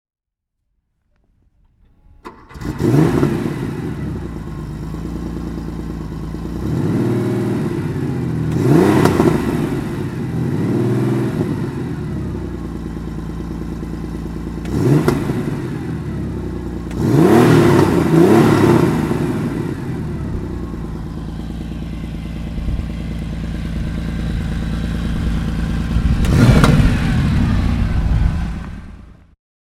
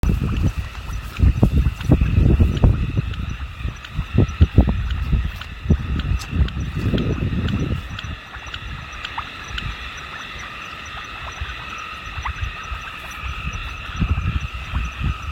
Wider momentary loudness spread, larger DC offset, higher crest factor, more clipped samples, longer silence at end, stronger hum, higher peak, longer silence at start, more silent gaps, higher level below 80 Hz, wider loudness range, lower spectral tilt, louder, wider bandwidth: about the same, 15 LU vs 14 LU; neither; about the same, 18 dB vs 20 dB; neither; first, 0.6 s vs 0 s; neither; about the same, 0 dBFS vs 0 dBFS; first, 2.25 s vs 0.05 s; neither; about the same, -26 dBFS vs -26 dBFS; about the same, 12 LU vs 10 LU; about the same, -7.5 dB/octave vs -7 dB/octave; first, -18 LUFS vs -23 LUFS; about the same, 15.5 kHz vs 15.5 kHz